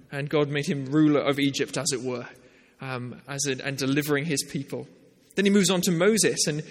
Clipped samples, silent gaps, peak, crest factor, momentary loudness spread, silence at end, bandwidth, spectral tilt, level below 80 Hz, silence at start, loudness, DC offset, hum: under 0.1%; none; -10 dBFS; 16 dB; 14 LU; 0 s; 16.5 kHz; -4 dB/octave; -66 dBFS; 0.1 s; -25 LUFS; under 0.1%; none